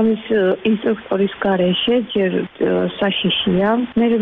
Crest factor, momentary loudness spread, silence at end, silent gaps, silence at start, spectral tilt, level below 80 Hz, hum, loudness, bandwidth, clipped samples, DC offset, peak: 12 dB; 3 LU; 0 s; none; 0 s; -9 dB/octave; -52 dBFS; none; -18 LUFS; 4 kHz; under 0.1%; under 0.1%; -6 dBFS